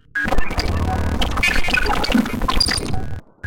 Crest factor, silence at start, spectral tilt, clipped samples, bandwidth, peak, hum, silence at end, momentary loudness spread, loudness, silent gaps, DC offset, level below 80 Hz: 12 dB; 0 s; -4 dB/octave; under 0.1%; 17 kHz; -4 dBFS; none; 0 s; 5 LU; -20 LUFS; none; under 0.1%; -24 dBFS